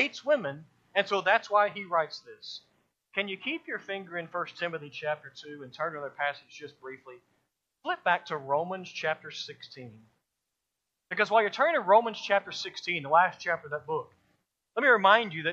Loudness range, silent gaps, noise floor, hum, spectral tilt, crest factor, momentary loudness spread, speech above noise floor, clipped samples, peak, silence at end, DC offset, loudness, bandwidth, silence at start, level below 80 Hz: 9 LU; none; -85 dBFS; none; -4 dB/octave; 24 dB; 20 LU; 56 dB; under 0.1%; -6 dBFS; 0 s; under 0.1%; -28 LUFS; 7.6 kHz; 0 s; -82 dBFS